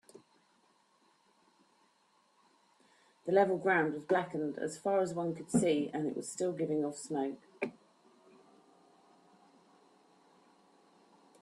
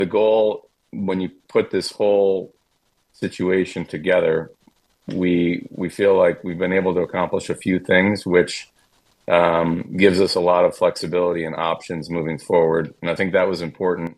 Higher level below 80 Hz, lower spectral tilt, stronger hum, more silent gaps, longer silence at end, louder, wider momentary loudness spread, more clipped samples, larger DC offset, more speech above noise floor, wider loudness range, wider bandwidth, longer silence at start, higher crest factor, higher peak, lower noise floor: second, -78 dBFS vs -56 dBFS; about the same, -5.5 dB/octave vs -6 dB/octave; neither; neither; first, 3.7 s vs 0.05 s; second, -34 LUFS vs -20 LUFS; about the same, 11 LU vs 10 LU; neither; neither; second, 39 dB vs 47 dB; first, 12 LU vs 4 LU; about the same, 12.5 kHz vs 12.5 kHz; first, 3.25 s vs 0 s; about the same, 20 dB vs 20 dB; second, -16 dBFS vs 0 dBFS; first, -71 dBFS vs -67 dBFS